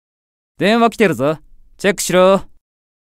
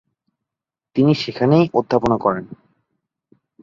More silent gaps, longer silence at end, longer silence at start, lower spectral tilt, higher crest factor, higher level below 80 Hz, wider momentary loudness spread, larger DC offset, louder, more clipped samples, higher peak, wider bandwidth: neither; second, 0.75 s vs 1.1 s; second, 0.6 s vs 0.95 s; second, -4.5 dB/octave vs -8 dB/octave; about the same, 16 dB vs 18 dB; first, -46 dBFS vs -52 dBFS; about the same, 7 LU vs 8 LU; neither; first, -15 LUFS vs -18 LUFS; neither; about the same, 0 dBFS vs -2 dBFS; first, 16 kHz vs 7.4 kHz